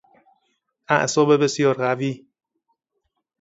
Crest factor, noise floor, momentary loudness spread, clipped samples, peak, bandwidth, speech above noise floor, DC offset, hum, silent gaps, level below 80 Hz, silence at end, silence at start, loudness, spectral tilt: 22 dB; -76 dBFS; 10 LU; under 0.1%; -2 dBFS; 8 kHz; 57 dB; under 0.1%; none; none; -68 dBFS; 1.25 s; 0.9 s; -20 LUFS; -5 dB/octave